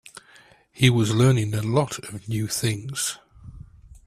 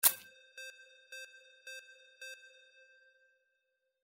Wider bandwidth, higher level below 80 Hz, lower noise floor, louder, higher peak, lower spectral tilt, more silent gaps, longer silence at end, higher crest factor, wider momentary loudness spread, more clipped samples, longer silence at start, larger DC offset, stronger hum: about the same, 15 kHz vs 16 kHz; first, -52 dBFS vs -86 dBFS; second, -54 dBFS vs -83 dBFS; first, -23 LUFS vs -41 LUFS; first, -2 dBFS vs -8 dBFS; first, -5 dB/octave vs 2.5 dB/octave; neither; second, 0.45 s vs 1.55 s; second, 22 dB vs 34 dB; about the same, 11 LU vs 13 LU; neither; about the same, 0.15 s vs 0.05 s; neither; neither